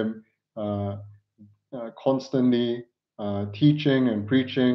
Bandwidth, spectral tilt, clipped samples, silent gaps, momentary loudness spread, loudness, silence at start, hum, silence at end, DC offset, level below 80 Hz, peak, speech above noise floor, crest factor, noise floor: 6.2 kHz; -8 dB/octave; under 0.1%; none; 16 LU; -25 LUFS; 0 s; none; 0 s; under 0.1%; -72 dBFS; -8 dBFS; 32 dB; 18 dB; -56 dBFS